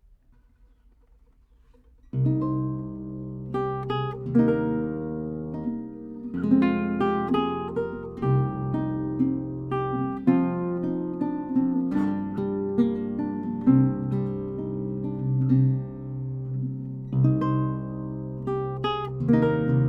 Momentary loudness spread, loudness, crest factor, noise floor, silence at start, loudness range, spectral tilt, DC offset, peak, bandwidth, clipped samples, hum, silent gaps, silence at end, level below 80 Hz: 11 LU; -26 LUFS; 18 dB; -57 dBFS; 2.15 s; 3 LU; -10.5 dB/octave; under 0.1%; -6 dBFS; 4.2 kHz; under 0.1%; none; none; 0 s; -52 dBFS